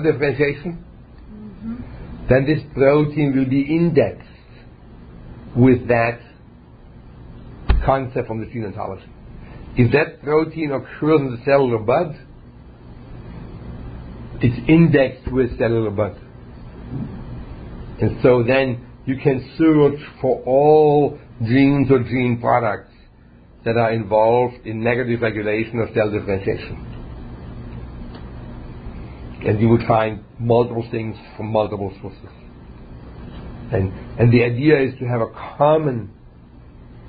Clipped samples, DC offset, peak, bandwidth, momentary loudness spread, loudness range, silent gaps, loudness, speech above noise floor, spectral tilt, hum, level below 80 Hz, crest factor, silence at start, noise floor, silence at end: under 0.1%; under 0.1%; -2 dBFS; 5 kHz; 21 LU; 7 LU; none; -18 LUFS; 29 dB; -12.5 dB/octave; none; -36 dBFS; 18 dB; 0 s; -46 dBFS; 0 s